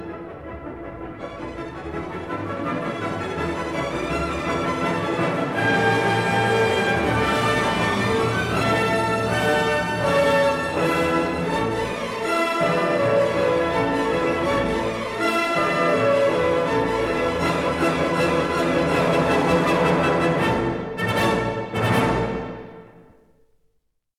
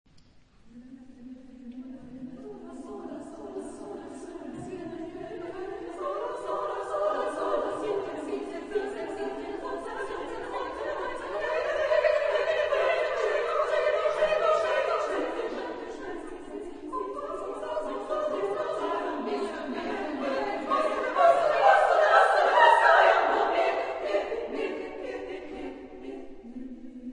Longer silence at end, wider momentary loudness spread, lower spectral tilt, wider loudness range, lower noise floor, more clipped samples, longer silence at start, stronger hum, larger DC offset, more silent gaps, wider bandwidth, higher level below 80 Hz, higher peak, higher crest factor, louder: first, 1.15 s vs 0 s; second, 12 LU vs 21 LU; first, -5.5 dB/octave vs -3.5 dB/octave; second, 5 LU vs 18 LU; first, -70 dBFS vs -56 dBFS; neither; second, 0 s vs 0.65 s; neither; neither; neither; first, 16.5 kHz vs 10.5 kHz; first, -44 dBFS vs -58 dBFS; about the same, -6 dBFS vs -6 dBFS; second, 16 dB vs 22 dB; first, -21 LUFS vs -27 LUFS